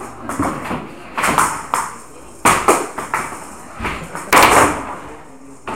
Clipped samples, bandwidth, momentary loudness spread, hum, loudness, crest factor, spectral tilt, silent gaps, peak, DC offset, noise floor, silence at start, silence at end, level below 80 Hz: under 0.1%; 17 kHz; 21 LU; none; -16 LUFS; 18 dB; -3 dB/octave; none; 0 dBFS; 0.9%; -39 dBFS; 0 s; 0 s; -40 dBFS